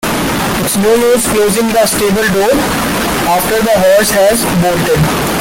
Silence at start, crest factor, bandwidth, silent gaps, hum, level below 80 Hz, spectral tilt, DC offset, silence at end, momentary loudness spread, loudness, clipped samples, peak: 0 s; 10 dB; 17 kHz; none; none; -32 dBFS; -4 dB/octave; under 0.1%; 0 s; 5 LU; -10 LUFS; under 0.1%; 0 dBFS